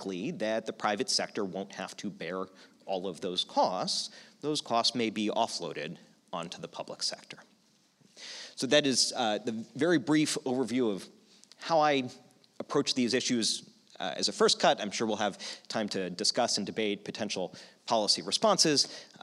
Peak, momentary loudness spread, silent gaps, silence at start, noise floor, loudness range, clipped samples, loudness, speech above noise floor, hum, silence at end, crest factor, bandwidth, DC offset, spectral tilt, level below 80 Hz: -10 dBFS; 15 LU; none; 0 s; -67 dBFS; 5 LU; under 0.1%; -30 LUFS; 36 dB; none; 0 s; 22 dB; 14 kHz; under 0.1%; -3 dB/octave; -86 dBFS